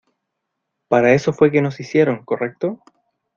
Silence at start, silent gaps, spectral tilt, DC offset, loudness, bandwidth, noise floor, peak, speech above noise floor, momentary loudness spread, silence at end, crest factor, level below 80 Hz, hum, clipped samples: 0.9 s; none; -7 dB/octave; under 0.1%; -18 LUFS; 7.4 kHz; -77 dBFS; -2 dBFS; 60 dB; 11 LU; 0.6 s; 18 dB; -58 dBFS; none; under 0.1%